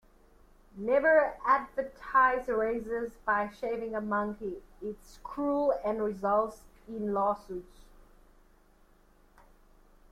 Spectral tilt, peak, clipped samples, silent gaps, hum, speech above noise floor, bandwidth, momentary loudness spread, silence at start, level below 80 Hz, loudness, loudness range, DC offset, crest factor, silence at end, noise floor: -6.5 dB/octave; -12 dBFS; under 0.1%; none; none; 32 dB; 14 kHz; 17 LU; 0.75 s; -56 dBFS; -30 LUFS; 9 LU; under 0.1%; 20 dB; 2.3 s; -62 dBFS